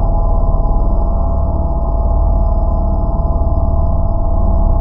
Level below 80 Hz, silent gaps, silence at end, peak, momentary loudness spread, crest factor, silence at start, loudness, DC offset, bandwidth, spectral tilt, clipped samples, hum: -14 dBFS; none; 0 s; -2 dBFS; 2 LU; 10 dB; 0 s; -17 LUFS; under 0.1%; 1.4 kHz; -14.5 dB/octave; under 0.1%; none